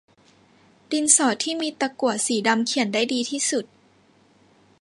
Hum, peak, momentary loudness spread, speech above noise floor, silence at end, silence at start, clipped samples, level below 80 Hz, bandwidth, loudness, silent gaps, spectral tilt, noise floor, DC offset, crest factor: none; -2 dBFS; 9 LU; 36 dB; 1.15 s; 0.9 s; under 0.1%; -74 dBFS; 11.5 kHz; -22 LUFS; none; -1.5 dB/octave; -58 dBFS; under 0.1%; 24 dB